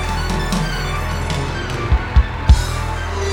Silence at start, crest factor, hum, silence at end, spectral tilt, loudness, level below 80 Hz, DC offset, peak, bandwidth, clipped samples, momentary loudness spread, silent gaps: 0 s; 18 dB; none; 0 s; -5 dB/octave; -19 LUFS; -20 dBFS; under 0.1%; 0 dBFS; 18 kHz; under 0.1%; 7 LU; none